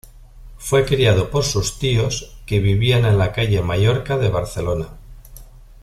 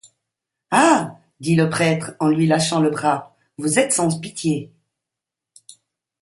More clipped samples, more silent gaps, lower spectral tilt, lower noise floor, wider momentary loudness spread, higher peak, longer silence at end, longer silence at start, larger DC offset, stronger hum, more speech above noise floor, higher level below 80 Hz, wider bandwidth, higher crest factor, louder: neither; neither; about the same, -5.5 dB/octave vs -4.5 dB/octave; second, -40 dBFS vs -85 dBFS; about the same, 8 LU vs 10 LU; about the same, -2 dBFS vs -2 dBFS; second, 0.4 s vs 1.55 s; second, 0.05 s vs 0.7 s; neither; neither; second, 23 dB vs 67 dB; first, -34 dBFS vs -62 dBFS; first, 14.5 kHz vs 11.5 kHz; about the same, 16 dB vs 20 dB; about the same, -19 LUFS vs -19 LUFS